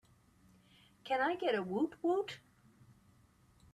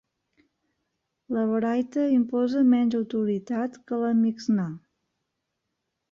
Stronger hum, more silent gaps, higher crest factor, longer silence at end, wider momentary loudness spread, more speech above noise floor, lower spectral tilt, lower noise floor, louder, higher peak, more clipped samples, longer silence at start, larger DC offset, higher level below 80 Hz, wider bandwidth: neither; neither; about the same, 18 dB vs 14 dB; about the same, 1.35 s vs 1.35 s; first, 15 LU vs 9 LU; second, 32 dB vs 57 dB; second, -6 dB/octave vs -8 dB/octave; second, -67 dBFS vs -81 dBFS; second, -36 LUFS vs -25 LUFS; second, -22 dBFS vs -12 dBFS; neither; second, 1.05 s vs 1.3 s; neither; about the same, -76 dBFS vs -72 dBFS; first, 13 kHz vs 7.2 kHz